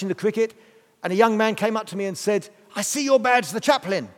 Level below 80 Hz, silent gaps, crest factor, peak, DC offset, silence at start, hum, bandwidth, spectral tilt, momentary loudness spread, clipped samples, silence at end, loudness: -78 dBFS; none; 20 dB; -2 dBFS; under 0.1%; 0 s; none; 17.5 kHz; -3.5 dB/octave; 9 LU; under 0.1%; 0.05 s; -22 LUFS